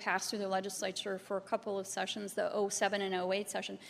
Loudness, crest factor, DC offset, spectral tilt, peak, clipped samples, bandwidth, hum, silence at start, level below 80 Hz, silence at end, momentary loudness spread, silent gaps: -36 LUFS; 20 dB; under 0.1%; -2.5 dB/octave; -16 dBFS; under 0.1%; 15.5 kHz; none; 0 s; -82 dBFS; 0 s; 5 LU; none